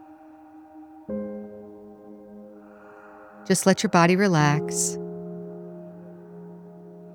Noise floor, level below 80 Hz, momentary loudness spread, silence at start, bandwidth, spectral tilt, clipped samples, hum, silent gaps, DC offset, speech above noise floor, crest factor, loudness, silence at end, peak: -48 dBFS; -64 dBFS; 27 LU; 0 s; 18.5 kHz; -5 dB/octave; under 0.1%; none; none; under 0.1%; 28 dB; 22 dB; -23 LUFS; 0 s; -4 dBFS